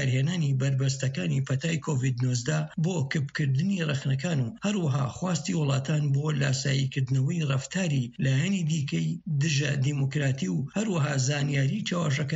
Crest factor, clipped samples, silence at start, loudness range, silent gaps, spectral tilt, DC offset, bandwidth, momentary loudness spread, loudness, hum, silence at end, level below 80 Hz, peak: 12 dB; under 0.1%; 0 s; 1 LU; none; -5.5 dB/octave; under 0.1%; 8 kHz; 3 LU; -27 LUFS; none; 0 s; -62 dBFS; -14 dBFS